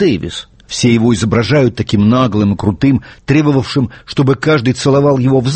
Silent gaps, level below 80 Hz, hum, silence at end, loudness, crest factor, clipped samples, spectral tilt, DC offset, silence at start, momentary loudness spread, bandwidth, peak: none; -38 dBFS; none; 0 s; -12 LUFS; 12 dB; under 0.1%; -6.5 dB/octave; under 0.1%; 0 s; 7 LU; 8.8 kHz; 0 dBFS